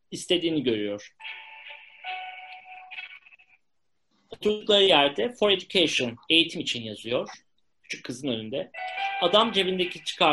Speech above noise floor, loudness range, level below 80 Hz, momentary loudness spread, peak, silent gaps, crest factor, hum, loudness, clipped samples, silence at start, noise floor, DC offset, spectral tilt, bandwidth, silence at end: 56 dB; 14 LU; -66 dBFS; 19 LU; -6 dBFS; none; 22 dB; none; -24 LUFS; under 0.1%; 0.1 s; -81 dBFS; under 0.1%; -3.5 dB/octave; 11.5 kHz; 0 s